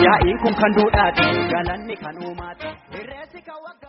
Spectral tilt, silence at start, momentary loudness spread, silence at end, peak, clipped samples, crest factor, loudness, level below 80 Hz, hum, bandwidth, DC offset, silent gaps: -3.5 dB/octave; 0 s; 21 LU; 0 s; 0 dBFS; under 0.1%; 18 dB; -18 LUFS; -36 dBFS; none; 5.8 kHz; under 0.1%; none